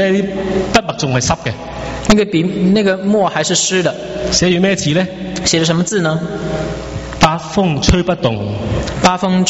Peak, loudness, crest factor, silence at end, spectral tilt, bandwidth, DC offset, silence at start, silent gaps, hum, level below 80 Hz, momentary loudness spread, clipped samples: 0 dBFS; -15 LUFS; 14 dB; 0 s; -4.5 dB/octave; 8.2 kHz; under 0.1%; 0 s; none; none; -30 dBFS; 8 LU; under 0.1%